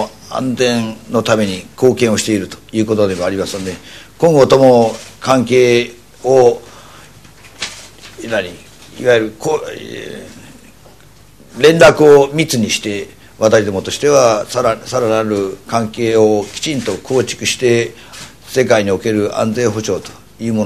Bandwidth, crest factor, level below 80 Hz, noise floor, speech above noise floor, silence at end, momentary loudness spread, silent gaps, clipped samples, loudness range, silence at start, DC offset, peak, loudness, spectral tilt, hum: 14.5 kHz; 14 dB; -48 dBFS; -43 dBFS; 30 dB; 0 s; 17 LU; none; 0.3%; 8 LU; 0 s; 0.5%; 0 dBFS; -13 LUFS; -4.5 dB/octave; none